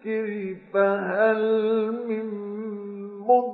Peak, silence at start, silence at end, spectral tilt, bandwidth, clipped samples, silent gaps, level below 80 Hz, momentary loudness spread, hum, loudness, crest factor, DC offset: -8 dBFS; 0.05 s; 0 s; -10.5 dB/octave; 4.5 kHz; under 0.1%; none; -80 dBFS; 12 LU; none; -25 LUFS; 18 dB; under 0.1%